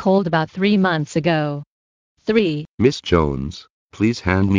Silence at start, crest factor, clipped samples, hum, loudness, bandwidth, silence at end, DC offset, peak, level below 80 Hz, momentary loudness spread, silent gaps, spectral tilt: 0 s; 16 dB; under 0.1%; none; -19 LUFS; 9.4 kHz; 0 s; under 0.1%; -2 dBFS; -40 dBFS; 11 LU; 1.67-2.16 s, 2.68-2.78 s, 3.70-3.89 s; -6.5 dB/octave